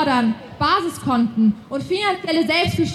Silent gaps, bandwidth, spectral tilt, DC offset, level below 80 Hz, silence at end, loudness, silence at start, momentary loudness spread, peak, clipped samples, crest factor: none; 13 kHz; -5.5 dB/octave; under 0.1%; -48 dBFS; 0 s; -19 LUFS; 0 s; 5 LU; -6 dBFS; under 0.1%; 14 dB